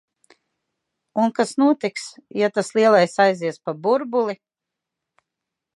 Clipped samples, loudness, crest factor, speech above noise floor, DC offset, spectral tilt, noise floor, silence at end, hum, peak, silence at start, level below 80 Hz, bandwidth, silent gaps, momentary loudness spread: under 0.1%; -20 LUFS; 20 dB; 65 dB; under 0.1%; -5 dB/octave; -85 dBFS; 1.4 s; none; -2 dBFS; 1.15 s; -78 dBFS; 11.5 kHz; none; 13 LU